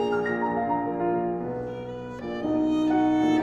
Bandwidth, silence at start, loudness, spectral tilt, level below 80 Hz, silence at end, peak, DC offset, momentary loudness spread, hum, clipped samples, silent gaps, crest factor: 7.4 kHz; 0 s; -26 LUFS; -7 dB/octave; -54 dBFS; 0 s; -12 dBFS; under 0.1%; 12 LU; none; under 0.1%; none; 14 dB